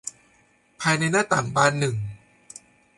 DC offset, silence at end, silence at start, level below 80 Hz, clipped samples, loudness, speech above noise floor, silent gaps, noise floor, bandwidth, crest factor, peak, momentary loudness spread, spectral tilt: under 0.1%; 0.8 s; 0.05 s; -58 dBFS; under 0.1%; -22 LUFS; 39 dB; none; -61 dBFS; 11.5 kHz; 22 dB; -4 dBFS; 24 LU; -4 dB/octave